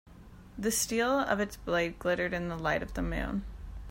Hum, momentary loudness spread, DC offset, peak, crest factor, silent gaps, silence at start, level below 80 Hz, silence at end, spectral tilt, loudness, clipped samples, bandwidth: none; 10 LU; under 0.1%; -14 dBFS; 20 dB; none; 0.05 s; -44 dBFS; 0 s; -4 dB/octave; -31 LUFS; under 0.1%; 16 kHz